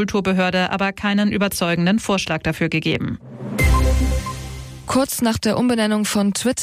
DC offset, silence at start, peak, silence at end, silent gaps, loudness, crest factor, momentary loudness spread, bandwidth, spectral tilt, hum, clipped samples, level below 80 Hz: under 0.1%; 0 s; -6 dBFS; 0 s; none; -19 LUFS; 12 dB; 10 LU; 15.5 kHz; -5 dB/octave; none; under 0.1%; -28 dBFS